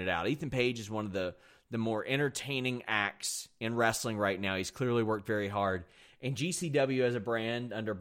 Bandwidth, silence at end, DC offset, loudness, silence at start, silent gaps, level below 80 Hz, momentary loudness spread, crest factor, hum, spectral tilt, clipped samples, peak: 16 kHz; 0 s; under 0.1%; -33 LUFS; 0 s; none; -66 dBFS; 7 LU; 20 dB; none; -4.5 dB/octave; under 0.1%; -14 dBFS